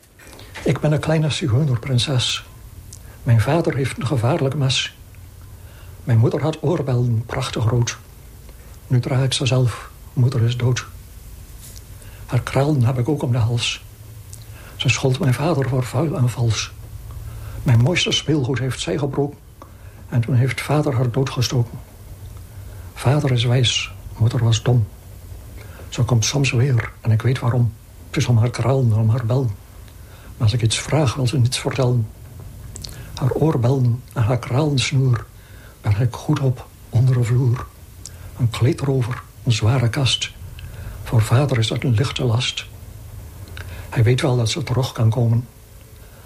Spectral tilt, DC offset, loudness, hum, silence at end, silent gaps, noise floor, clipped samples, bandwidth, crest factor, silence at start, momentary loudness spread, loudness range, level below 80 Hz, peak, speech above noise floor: -5.5 dB/octave; under 0.1%; -20 LUFS; none; 0.05 s; none; -42 dBFS; under 0.1%; 15 kHz; 16 dB; 0.2 s; 20 LU; 2 LU; -42 dBFS; -4 dBFS; 24 dB